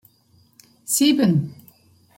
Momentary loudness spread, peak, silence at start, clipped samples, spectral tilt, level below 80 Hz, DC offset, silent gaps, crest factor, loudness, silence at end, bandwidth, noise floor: 19 LU; -6 dBFS; 0.9 s; under 0.1%; -4.5 dB/octave; -66 dBFS; under 0.1%; none; 18 dB; -19 LUFS; 0.65 s; 16.5 kHz; -58 dBFS